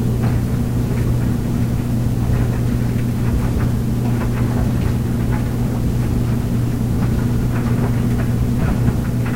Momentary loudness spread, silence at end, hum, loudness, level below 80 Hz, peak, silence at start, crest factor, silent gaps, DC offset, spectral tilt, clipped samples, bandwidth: 1 LU; 0 s; none; -19 LUFS; -26 dBFS; -2 dBFS; 0 s; 16 dB; none; 2%; -8 dB/octave; under 0.1%; 16 kHz